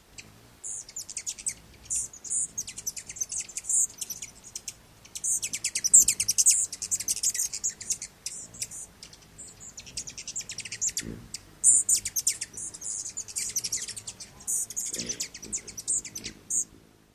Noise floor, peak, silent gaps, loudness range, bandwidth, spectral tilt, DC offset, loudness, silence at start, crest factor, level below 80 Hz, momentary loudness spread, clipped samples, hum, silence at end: -56 dBFS; -4 dBFS; none; 10 LU; 16 kHz; 1 dB/octave; under 0.1%; -26 LUFS; 0.2 s; 28 dB; -60 dBFS; 19 LU; under 0.1%; none; 0.4 s